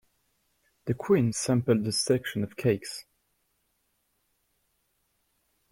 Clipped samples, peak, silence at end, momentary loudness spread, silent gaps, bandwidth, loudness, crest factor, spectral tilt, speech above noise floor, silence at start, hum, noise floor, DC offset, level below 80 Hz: under 0.1%; -10 dBFS; 2.7 s; 13 LU; none; 16.5 kHz; -27 LUFS; 20 dB; -5 dB/octave; 48 dB; 0.85 s; none; -75 dBFS; under 0.1%; -62 dBFS